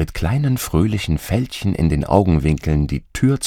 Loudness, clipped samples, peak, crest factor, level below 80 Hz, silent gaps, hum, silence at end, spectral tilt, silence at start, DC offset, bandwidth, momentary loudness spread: -19 LUFS; under 0.1%; 0 dBFS; 18 dB; -30 dBFS; none; none; 0 s; -6.5 dB/octave; 0 s; under 0.1%; 17.5 kHz; 6 LU